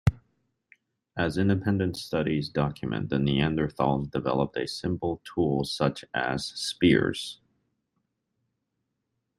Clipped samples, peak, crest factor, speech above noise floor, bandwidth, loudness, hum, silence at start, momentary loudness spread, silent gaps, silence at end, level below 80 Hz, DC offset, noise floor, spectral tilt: under 0.1%; -8 dBFS; 22 dB; 54 dB; 13 kHz; -27 LUFS; none; 0.05 s; 7 LU; none; 2.05 s; -50 dBFS; under 0.1%; -80 dBFS; -6 dB/octave